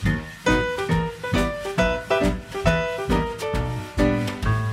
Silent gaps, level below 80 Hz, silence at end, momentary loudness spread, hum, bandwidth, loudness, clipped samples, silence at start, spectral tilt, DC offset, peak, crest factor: none; -32 dBFS; 0 s; 4 LU; none; 15.5 kHz; -24 LUFS; under 0.1%; 0 s; -6 dB/octave; under 0.1%; -4 dBFS; 20 dB